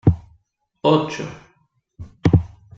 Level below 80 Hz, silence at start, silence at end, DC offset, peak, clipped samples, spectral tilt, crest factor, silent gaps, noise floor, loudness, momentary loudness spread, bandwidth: -38 dBFS; 0.05 s; 0.3 s; under 0.1%; -2 dBFS; under 0.1%; -7.5 dB/octave; 18 dB; none; -63 dBFS; -20 LUFS; 19 LU; 7.6 kHz